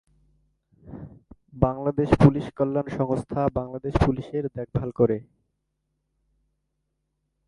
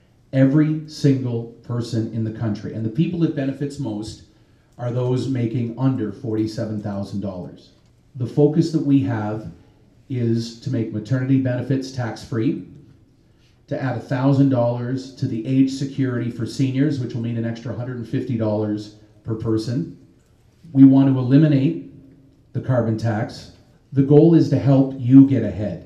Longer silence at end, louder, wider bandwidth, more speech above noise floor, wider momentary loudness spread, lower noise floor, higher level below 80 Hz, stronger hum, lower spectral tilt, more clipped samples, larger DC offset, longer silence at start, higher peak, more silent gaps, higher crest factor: first, 2.25 s vs 0 s; second, -24 LUFS vs -20 LUFS; first, 10.5 kHz vs 9 kHz; first, 54 dB vs 36 dB; about the same, 13 LU vs 15 LU; first, -77 dBFS vs -55 dBFS; first, -42 dBFS vs -56 dBFS; neither; about the same, -9 dB/octave vs -8.5 dB/octave; neither; neither; first, 0.85 s vs 0.35 s; about the same, 0 dBFS vs 0 dBFS; neither; first, 26 dB vs 20 dB